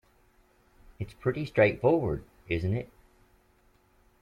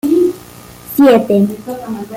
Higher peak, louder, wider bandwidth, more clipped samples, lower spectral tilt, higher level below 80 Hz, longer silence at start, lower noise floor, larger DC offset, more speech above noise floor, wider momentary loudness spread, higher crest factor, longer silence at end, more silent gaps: second, -10 dBFS vs -2 dBFS; second, -28 LUFS vs -12 LUFS; second, 11.5 kHz vs 17 kHz; neither; first, -8.5 dB/octave vs -6.5 dB/octave; about the same, -52 dBFS vs -50 dBFS; first, 1 s vs 0.05 s; first, -65 dBFS vs -36 dBFS; neither; first, 37 dB vs 23 dB; first, 18 LU vs 15 LU; first, 22 dB vs 12 dB; first, 1.35 s vs 0 s; neither